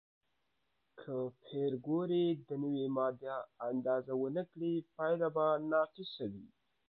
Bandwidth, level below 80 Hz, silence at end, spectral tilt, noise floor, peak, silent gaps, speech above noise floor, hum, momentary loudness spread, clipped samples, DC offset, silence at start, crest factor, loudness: 4.6 kHz; -82 dBFS; 0.45 s; -6 dB/octave; -83 dBFS; -20 dBFS; none; 47 dB; none; 10 LU; under 0.1%; under 0.1%; 0.95 s; 16 dB; -37 LUFS